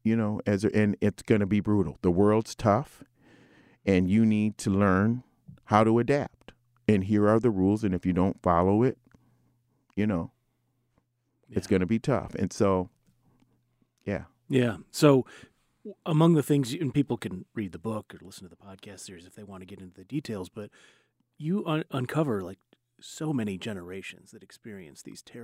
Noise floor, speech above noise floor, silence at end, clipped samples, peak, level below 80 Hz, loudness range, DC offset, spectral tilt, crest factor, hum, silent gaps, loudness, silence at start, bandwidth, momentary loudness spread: -74 dBFS; 47 dB; 0 s; under 0.1%; -6 dBFS; -58 dBFS; 10 LU; under 0.1%; -7 dB/octave; 22 dB; none; none; -27 LUFS; 0.05 s; 15.5 kHz; 22 LU